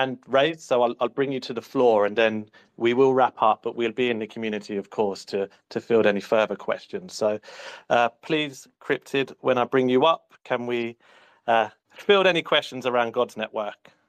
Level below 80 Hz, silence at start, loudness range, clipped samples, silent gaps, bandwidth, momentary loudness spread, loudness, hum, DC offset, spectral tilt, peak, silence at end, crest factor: -72 dBFS; 0 s; 3 LU; under 0.1%; none; 14 kHz; 12 LU; -24 LUFS; none; under 0.1%; -5 dB/octave; -6 dBFS; 0.35 s; 18 dB